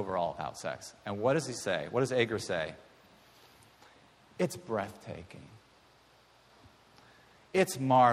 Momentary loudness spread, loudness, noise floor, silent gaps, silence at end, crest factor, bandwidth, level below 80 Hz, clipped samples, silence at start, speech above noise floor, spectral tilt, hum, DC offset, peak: 17 LU; -32 LUFS; -63 dBFS; none; 0 s; 22 dB; 15.5 kHz; -68 dBFS; under 0.1%; 0 s; 31 dB; -5 dB/octave; none; under 0.1%; -12 dBFS